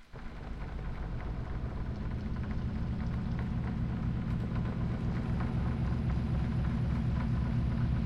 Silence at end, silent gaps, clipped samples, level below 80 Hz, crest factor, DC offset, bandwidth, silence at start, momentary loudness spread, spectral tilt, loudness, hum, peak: 0 s; none; under 0.1%; -38 dBFS; 12 dB; under 0.1%; 6.4 kHz; 0 s; 8 LU; -9 dB/octave; -35 LUFS; none; -20 dBFS